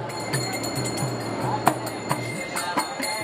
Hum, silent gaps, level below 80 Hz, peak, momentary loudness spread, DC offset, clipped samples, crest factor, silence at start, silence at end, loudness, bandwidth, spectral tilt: none; none; -58 dBFS; 0 dBFS; 4 LU; under 0.1%; under 0.1%; 26 dB; 0 s; 0 s; -26 LUFS; 17 kHz; -4 dB/octave